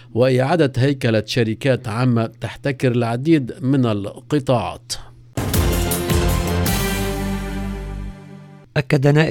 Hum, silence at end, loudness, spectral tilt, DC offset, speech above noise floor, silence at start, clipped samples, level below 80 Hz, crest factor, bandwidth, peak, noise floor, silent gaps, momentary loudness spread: none; 0 s; -20 LUFS; -6 dB/octave; under 0.1%; 22 dB; 0 s; under 0.1%; -30 dBFS; 18 dB; 18 kHz; 0 dBFS; -40 dBFS; none; 12 LU